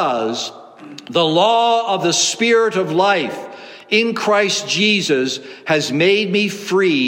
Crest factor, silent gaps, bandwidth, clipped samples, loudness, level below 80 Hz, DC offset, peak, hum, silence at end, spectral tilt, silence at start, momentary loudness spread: 16 dB; none; 16.5 kHz; under 0.1%; -16 LUFS; -70 dBFS; under 0.1%; -2 dBFS; none; 0 s; -3 dB/octave; 0 s; 12 LU